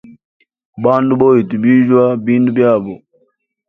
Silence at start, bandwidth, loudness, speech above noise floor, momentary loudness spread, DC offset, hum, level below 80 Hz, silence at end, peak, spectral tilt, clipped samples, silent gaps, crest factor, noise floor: 0.1 s; 3.7 kHz; -12 LUFS; 50 dB; 8 LU; under 0.1%; none; -56 dBFS; 0.7 s; 0 dBFS; -10.5 dB/octave; under 0.1%; 0.25-0.40 s, 0.65-0.73 s; 14 dB; -62 dBFS